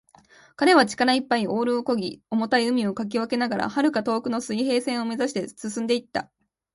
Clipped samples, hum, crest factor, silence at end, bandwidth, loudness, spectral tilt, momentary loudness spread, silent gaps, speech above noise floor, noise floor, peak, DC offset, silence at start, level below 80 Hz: under 0.1%; none; 20 dB; 0.5 s; 11.5 kHz; -24 LUFS; -4.5 dB/octave; 9 LU; none; 31 dB; -54 dBFS; -4 dBFS; under 0.1%; 0.6 s; -66 dBFS